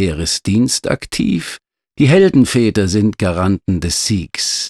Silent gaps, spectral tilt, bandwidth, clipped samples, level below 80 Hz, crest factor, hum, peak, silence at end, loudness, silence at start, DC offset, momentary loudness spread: none; -5 dB/octave; 13.5 kHz; under 0.1%; -36 dBFS; 14 dB; none; -2 dBFS; 0 s; -15 LUFS; 0 s; under 0.1%; 8 LU